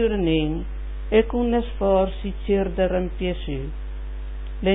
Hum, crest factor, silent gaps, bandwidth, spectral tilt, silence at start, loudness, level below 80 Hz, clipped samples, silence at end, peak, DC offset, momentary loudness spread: none; 16 dB; none; 4 kHz; -11.5 dB/octave; 0 s; -23 LUFS; -30 dBFS; under 0.1%; 0 s; -6 dBFS; under 0.1%; 14 LU